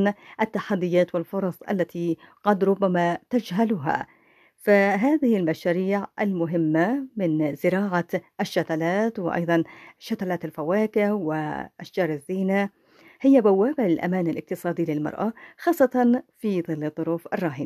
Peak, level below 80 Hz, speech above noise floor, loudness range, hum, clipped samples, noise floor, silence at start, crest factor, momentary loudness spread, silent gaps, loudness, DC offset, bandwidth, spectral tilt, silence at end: -6 dBFS; -68 dBFS; 34 dB; 3 LU; none; under 0.1%; -57 dBFS; 0 s; 18 dB; 9 LU; none; -24 LUFS; under 0.1%; 14.5 kHz; -7.5 dB/octave; 0 s